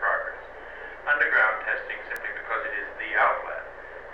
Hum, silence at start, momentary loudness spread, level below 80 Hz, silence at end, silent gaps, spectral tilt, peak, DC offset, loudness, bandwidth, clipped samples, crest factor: 60 Hz at -65 dBFS; 0 s; 19 LU; -56 dBFS; 0 s; none; -3.5 dB/octave; -10 dBFS; 0.2%; -26 LUFS; over 20 kHz; under 0.1%; 18 dB